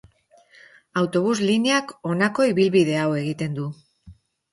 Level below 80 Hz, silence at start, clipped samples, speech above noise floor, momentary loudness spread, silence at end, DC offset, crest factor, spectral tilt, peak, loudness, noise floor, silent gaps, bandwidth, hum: -60 dBFS; 0.95 s; under 0.1%; 35 dB; 10 LU; 0.4 s; under 0.1%; 16 dB; -5.5 dB/octave; -6 dBFS; -22 LUFS; -56 dBFS; none; 11.5 kHz; none